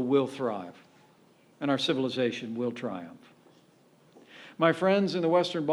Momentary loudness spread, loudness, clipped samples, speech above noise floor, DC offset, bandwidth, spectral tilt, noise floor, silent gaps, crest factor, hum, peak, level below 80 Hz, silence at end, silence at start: 17 LU; -28 LUFS; under 0.1%; 33 dB; under 0.1%; 12 kHz; -6 dB/octave; -61 dBFS; none; 20 dB; none; -10 dBFS; -80 dBFS; 0 s; 0 s